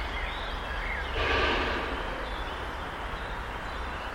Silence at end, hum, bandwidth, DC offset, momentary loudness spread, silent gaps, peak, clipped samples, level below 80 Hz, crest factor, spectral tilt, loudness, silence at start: 0 s; none; 16 kHz; under 0.1%; 10 LU; none; -14 dBFS; under 0.1%; -38 dBFS; 18 dB; -4.5 dB/octave; -32 LUFS; 0 s